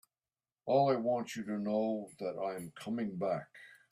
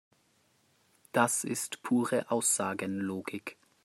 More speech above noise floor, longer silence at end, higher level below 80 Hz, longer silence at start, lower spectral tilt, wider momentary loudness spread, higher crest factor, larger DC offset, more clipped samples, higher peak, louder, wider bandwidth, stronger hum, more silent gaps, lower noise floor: first, over 55 dB vs 39 dB; second, 0.15 s vs 0.3 s; about the same, -80 dBFS vs -80 dBFS; second, 0.65 s vs 1.15 s; first, -6.5 dB/octave vs -3.5 dB/octave; about the same, 13 LU vs 11 LU; second, 18 dB vs 24 dB; neither; neither; second, -18 dBFS vs -10 dBFS; second, -35 LUFS vs -31 LUFS; about the same, 15 kHz vs 16 kHz; neither; neither; first, under -90 dBFS vs -70 dBFS